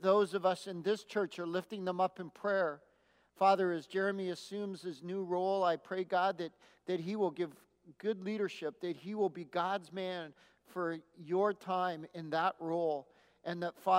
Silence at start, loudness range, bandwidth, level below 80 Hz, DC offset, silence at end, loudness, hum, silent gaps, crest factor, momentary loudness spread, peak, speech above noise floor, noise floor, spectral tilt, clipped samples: 0 s; 4 LU; 15.5 kHz; -86 dBFS; under 0.1%; 0 s; -36 LUFS; none; none; 20 dB; 10 LU; -16 dBFS; 35 dB; -70 dBFS; -6 dB/octave; under 0.1%